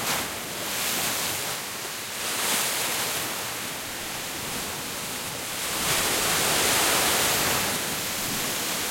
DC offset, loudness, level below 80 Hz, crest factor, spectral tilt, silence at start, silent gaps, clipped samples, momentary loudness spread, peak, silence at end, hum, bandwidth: under 0.1%; -25 LUFS; -54 dBFS; 18 dB; -1 dB/octave; 0 s; none; under 0.1%; 10 LU; -10 dBFS; 0 s; none; 16.5 kHz